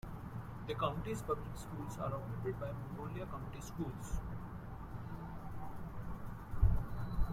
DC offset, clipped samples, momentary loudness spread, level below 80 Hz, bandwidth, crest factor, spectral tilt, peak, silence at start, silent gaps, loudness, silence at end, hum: under 0.1%; under 0.1%; 11 LU; -44 dBFS; 15.5 kHz; 22 dB; -7 dB/octave; -18 dBFS; 0.05 s; none; -43 LUFS; 0 s; none